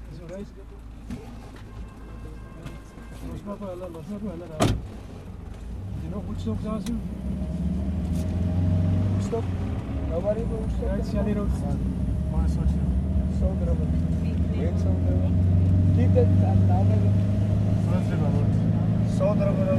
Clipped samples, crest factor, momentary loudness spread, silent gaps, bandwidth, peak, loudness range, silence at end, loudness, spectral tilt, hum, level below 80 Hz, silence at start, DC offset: under 0.1%; 18 dB; 20 LU; none; 11 kHz; -6 dBFS; 13 LU; 0 s; -25 LUFS; -8.5 dB/octave; none; -32 dBFS; 0 s; under 0.1%